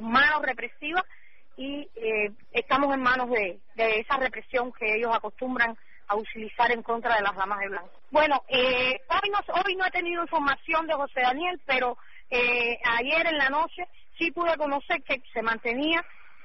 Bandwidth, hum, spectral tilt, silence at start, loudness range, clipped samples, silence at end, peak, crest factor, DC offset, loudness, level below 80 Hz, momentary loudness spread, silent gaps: 6 kHz; none; -5.5 dB/octave; 0 s; 2 LU; under 0.1%; 0.4 s; -10 dBFS; 16 dB; 0.7%; -26 LUFS; -56 dBFS; 9 LU; none